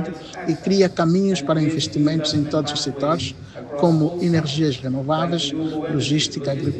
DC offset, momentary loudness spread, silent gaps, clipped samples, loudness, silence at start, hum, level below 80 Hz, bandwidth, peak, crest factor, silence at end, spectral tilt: under 0.1%; 7 LU; none; under 0.1%; -21 LUFS; 0 s; none; -52 dBFS; 9 kHz; -4 dBFS; 18 dB; 0 s; -5.5 dB/octave